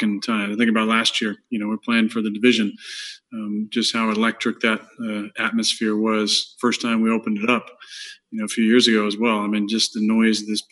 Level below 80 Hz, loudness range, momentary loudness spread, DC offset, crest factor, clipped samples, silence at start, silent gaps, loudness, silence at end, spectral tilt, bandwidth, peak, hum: -78 dBFS; 2 LU; 12 LU; under 0.1%; 18 dB; under 0.1%; 0 s; none; -20 LUFS; 0.1 s; -3.5 dB/octave; 12 kHz; -2 dBFS; none